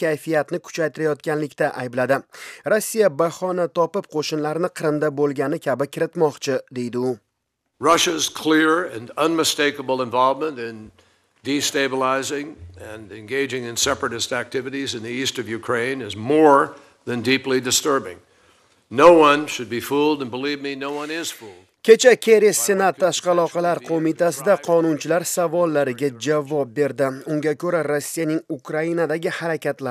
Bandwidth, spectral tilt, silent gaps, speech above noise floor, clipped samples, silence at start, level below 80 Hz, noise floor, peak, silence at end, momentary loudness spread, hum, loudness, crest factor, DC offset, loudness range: 15.5 kHz; -3.5 dB/octave; none; 55 dB; under 0.1%; 0 s; -62 dBFS; -75 dBFS; 0 dBFS; 0 s; 12 LU; none; -20 LUFS; 20 dB; under 0.1%; 6 LU